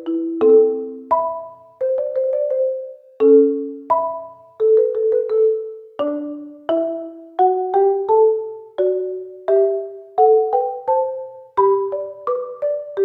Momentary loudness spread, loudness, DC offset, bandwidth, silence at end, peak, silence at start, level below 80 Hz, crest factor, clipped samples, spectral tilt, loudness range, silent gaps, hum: 14 LU; -18 LUFS; under 0.1%; 4 kHz; 0 s; -2 dBFS; 0 s; -72 dBFS; 16 dB; under 0.1%; -8.5 dB/octave; 2 LU; none; none